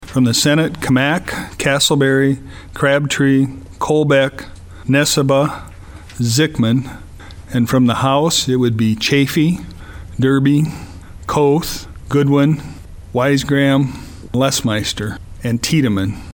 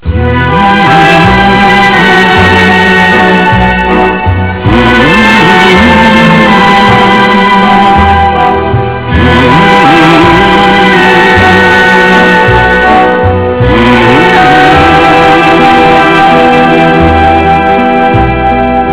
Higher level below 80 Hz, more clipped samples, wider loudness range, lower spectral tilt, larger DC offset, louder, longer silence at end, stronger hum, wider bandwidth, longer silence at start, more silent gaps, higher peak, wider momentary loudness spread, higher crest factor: second, -40 dBFS vs -20 dBFS; second, under 0.1% vs 10%; about the same, 2 LU vs 2 LU; second, -5 dB/octave vs -9.5 dB/octave; second, under 0.1% vs 2%; second, -16 LUFS vs -3 LUFS; about the same, 0 s vs 0 s; neither; first, 19 kHz vs 4 kHz; about the same, 0 s vs 0.05 s; neither; about the same, -2 dBFS vs 0 dBFS; first, 16 LU vs 5 LU; first, 14 dB vs 4 dB